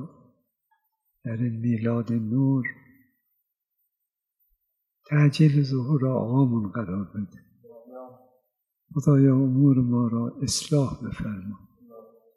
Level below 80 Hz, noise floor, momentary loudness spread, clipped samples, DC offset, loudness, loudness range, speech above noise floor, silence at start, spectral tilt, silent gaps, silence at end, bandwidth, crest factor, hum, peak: -58 dBFS; -84 dBFS; 18 LU; under 0.1%; under 0.1%; -24 LUFS; 5 LU; 61 dB; 0 s; -7 dB/octave; none; 0.35 s; 12 kHz; 18 dB; none; -8 dBFS